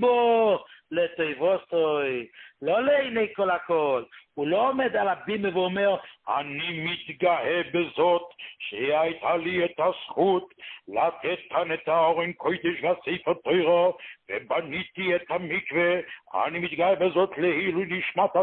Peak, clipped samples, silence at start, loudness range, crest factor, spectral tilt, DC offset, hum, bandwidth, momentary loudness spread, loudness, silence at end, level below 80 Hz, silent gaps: -10 dBFS; under 0.1%; 0 s; 1 LU; 16 dB; -9.5 dB/octave; under 0.1%; none; 4.3 kHz; 9 LU; -26 LUFS; 0 s; -66 dBFS; none